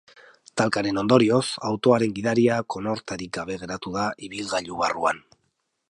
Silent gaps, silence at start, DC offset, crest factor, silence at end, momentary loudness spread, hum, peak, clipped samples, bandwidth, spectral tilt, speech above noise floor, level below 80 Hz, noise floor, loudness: none; 0.55 s; under 0.1%; 20 dB; 0.7 s; 12 LU; none; -4 dBFS; under 0.1%; 11.5 kHz; -5 dB/octave; 50 dB; -58 dBFS; -74 dBFS; -24 LUFS